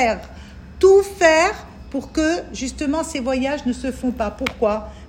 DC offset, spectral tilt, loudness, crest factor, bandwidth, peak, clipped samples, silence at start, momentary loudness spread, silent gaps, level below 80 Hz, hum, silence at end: under 0.1%; -4 dB/octave; -19 LUFS; 18 dB; 15.5 kHz; 0 dBFS; under 0.1%; 0 s; 16 LU; none; -40 dBFS; none; 0 s